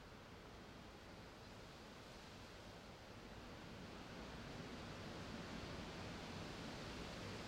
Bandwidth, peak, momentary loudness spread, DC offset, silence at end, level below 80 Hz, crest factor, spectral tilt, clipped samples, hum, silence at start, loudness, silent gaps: 16 kHz; -38 dBFS; 7 LU; under 0.1%; 0 s; -64 dBFS; 14 dB; -4.5 dB/octave; under 0.1%; none; 0 s; -54 LUFS; none